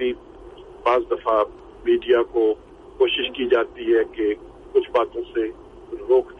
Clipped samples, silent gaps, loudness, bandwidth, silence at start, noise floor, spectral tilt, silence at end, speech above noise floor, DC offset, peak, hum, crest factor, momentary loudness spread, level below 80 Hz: under 0.1%; none; -22 LUFS; 5 kHz; 0 s; -42 dBFS; -6 dB/octave; 0.05 s; 21 dB; under 0.1%; -6 dBFS; none; 16 dB; 11 LU; -50 dBFS